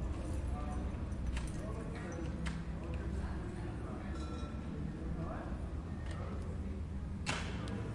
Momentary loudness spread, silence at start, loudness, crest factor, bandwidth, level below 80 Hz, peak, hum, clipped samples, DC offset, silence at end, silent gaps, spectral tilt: 3 LU; 0 s; -42 LUFS; 18 dB; 11.5 kHz; -44 dBFS; -22 dBFS; none; under 0.1%; under 0.1%; 0 s; none; -6.5 dB/octave